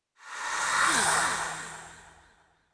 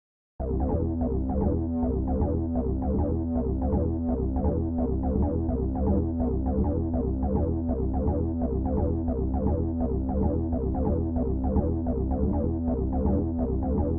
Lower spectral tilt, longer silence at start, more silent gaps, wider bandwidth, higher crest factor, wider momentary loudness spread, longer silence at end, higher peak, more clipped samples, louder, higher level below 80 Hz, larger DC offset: second, 0 dB/octave vs -15 dB/octave; second, 0.25 s vs 0.4 s; neither; first, 11 kHz vs 2 kHz; about the same, 18 dB vs 14 dB; first, 20 LU vs 2 LU; first, 0.65 s vs 0 s; about the same, -12 dBFS vs -12 dBFS; neither; about the same, -26 LUFS vs -27 LUFS; second, -60 dBFS vs -30 dBFS; neither